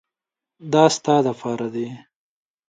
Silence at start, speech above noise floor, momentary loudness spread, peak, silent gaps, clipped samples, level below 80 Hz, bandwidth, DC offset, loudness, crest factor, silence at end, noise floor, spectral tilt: 0.6 s; 68 dB; 15 LU; 0 dBFS; none; under 0.1%; -70 dBFS; 9.4 kHz; under 0.1%; -20 LUFS; 22 dB; 0.7 s; -88 dBFS; -5 dB/octave